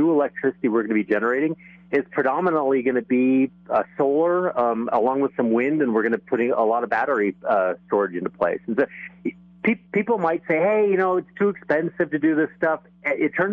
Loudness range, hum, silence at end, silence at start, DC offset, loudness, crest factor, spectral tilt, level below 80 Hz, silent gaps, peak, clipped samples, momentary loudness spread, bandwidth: 2 LU; none; 0 s; 0 s; under 0.1%; -22 LUFS; 14 dB; -9.5 dB/octave; -68 dBFS; none; -8 dBFS; under 0.1%; 5 LU; 5 kHz